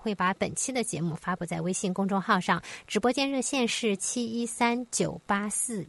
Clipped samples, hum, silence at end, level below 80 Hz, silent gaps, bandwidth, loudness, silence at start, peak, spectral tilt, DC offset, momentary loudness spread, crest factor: under 0.1%; none; 0 s; -62 dBFS; none; 11.5 kHz; -28 LUFS; 0 s; -10 dBFS; -3.5 dB/octave; under 0.1%; 5 LU; 18 dB